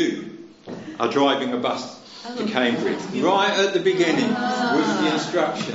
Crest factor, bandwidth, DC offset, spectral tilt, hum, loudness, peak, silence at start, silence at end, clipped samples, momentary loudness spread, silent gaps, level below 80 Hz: 18 dB; 8 kHz; under 0.1%; -2.5 dB/octave; none; -21 LUFS; -4 dBFS; 0 s; 0 s; under 0.1%; 17 LU; none; -70 dBFS